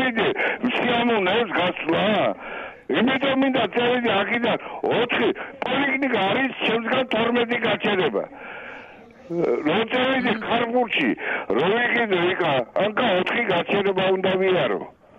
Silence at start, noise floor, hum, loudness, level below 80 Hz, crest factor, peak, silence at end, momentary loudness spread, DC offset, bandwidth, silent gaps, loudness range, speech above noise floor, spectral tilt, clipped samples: 0 s; -44 dBFS; none; -21 LUFS; -62 dBFS; 12 dB; -10 dBFS; 0.3 s; 6 LU; under 0.1%; 7.6 kHz; none; 2 LU; 22 dB; -7 dB/octave; under 0.1%